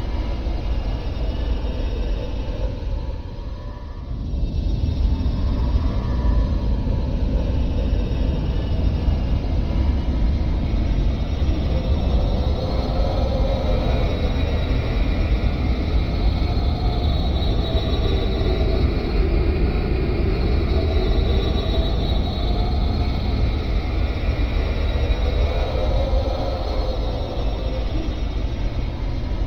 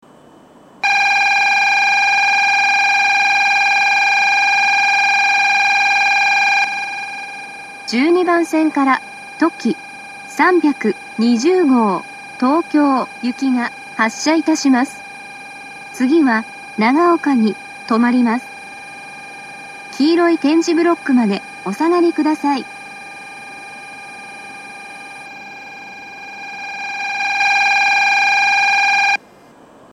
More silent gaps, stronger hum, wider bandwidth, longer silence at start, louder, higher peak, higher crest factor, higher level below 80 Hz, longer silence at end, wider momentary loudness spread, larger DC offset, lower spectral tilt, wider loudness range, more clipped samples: neither; neither; second, 6.4 kHz vs 13 kHz; second, 0 s vs 0.85 s; second, -23 LUFS vs -14 LUFS; second, -8 dBFS vs 0 dBFS; about the same, 12 dB vs 16 dB; first, -22 dBFS vs -68 dBFS; second, 0 s vs 0.75 s; second, 6 LU vs 20 LU; neither; first, -8 dB/octave vs -3.5 dB/octave; second, 4 LU vs 9 LU; neither